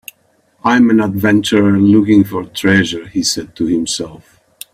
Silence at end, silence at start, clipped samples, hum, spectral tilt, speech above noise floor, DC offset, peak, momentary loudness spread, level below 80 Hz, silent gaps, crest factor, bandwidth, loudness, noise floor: 0.6 s; 0.65 s; under 0.1%; none; -5 dB/octave; 44 dB; under 0.1%; 0 dBFS; 9 LU; -48 dBFS; none; 14 dB; 16 kHz; -13 LUFS; -56 dBFS